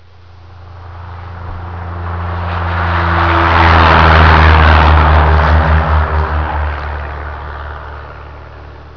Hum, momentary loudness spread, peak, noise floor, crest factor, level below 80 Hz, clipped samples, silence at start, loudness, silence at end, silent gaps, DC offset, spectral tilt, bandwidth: none; 22 LU; 0 dBFS; -38 dBFS; 12 dB; -16 dBFS; under 0.1%; 0.5 s; -10 LUFS; 0.05 s; none; 0.8%; -7.5 dB/octave; 5.4 kHz